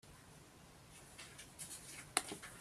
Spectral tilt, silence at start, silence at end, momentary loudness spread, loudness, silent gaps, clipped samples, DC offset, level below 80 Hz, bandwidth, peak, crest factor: -1.5 dB/octave; 0.05 s; 0 s; 20 LU; -45 LUFS; none; under 0.1%; under 0.1%; -72 dBFS; 15.5 kHz; -14 dBFS; 36 dB